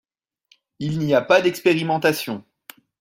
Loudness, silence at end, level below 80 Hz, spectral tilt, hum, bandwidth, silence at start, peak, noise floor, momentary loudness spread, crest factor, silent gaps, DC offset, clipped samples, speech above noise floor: -20 LUFS; 0.6 s; -62 dBFS; -5.5 dB/octave; none; 16.5 kHz; 0.8 s; -2 dBFS; -62 dBFS; 14 LU; 20 dB; none; under 0.1%; under 0.1%; 42 dB